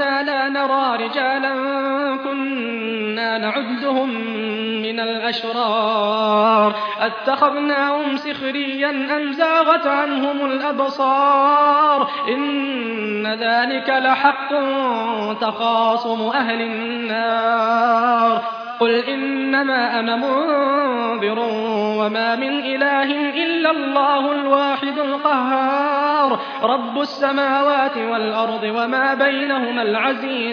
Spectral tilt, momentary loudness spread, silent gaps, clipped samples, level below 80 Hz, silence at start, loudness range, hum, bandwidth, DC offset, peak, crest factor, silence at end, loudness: -5.5 dB/octave; 7 LU; none; under 0.1%; -74 dBFS; 0 s; 3 LU; none; 5.4 kHz; under 0.1%; -2 dBFS; 16 dB; 0 s; -18 LUFS